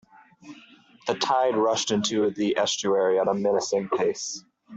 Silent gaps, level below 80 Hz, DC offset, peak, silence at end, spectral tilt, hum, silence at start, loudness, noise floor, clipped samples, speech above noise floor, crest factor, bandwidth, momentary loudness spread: none; -70 dBFS; under 0.1%; -10 dBFS; 0 s; -3.5 dB/octave; none; 0.45 s; -24 LUFS; -53 dBFS; under 0.1%; 29 dB; 16 dB; 8.2 kHz; 9 LU